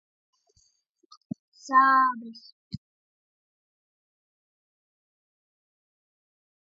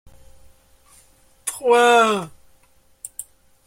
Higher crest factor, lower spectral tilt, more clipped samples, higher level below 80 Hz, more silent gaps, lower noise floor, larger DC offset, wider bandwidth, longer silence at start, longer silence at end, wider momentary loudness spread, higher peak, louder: about the same, 24 dB vs 20 dB; first, -4.5 dB/octave vs -2.5 dB/octave; neither; second, -70 dBFS vs -58 dBFS; first, 2.52-2.71 s vs none; first, -70 dBFS vs -56 dBFS; neither; second, 7.6 kHz vs 16.5 kHz; first, 1.65 s vs 1.45 s; first, 4 s vs 0.45 s; about the same, 24 LU vs 23 LU; second, -8 dBFS vs -2 dBFS; second, -21 LUFS vs -17 LUFS